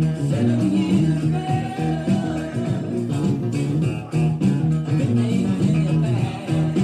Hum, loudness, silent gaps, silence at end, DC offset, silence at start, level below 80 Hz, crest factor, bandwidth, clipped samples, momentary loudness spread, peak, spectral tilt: none; -21 LUFS; none; 0 s; under 0.1%; 0 s; -46 dBFS; 10 dB; 10.5 kHz; under 0.1%; 5 LU; -10 dBFS; -8 dB/octave